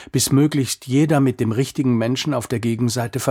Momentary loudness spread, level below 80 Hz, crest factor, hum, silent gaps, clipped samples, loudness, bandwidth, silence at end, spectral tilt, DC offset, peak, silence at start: 6 LU; -54 dBFS; 16 dB; none; none; under 0.1%; -19 LUFS; 16.5 kHz; 0 s; -5.5 dB/octave; under 0.1%; -4 dBFS; 0 s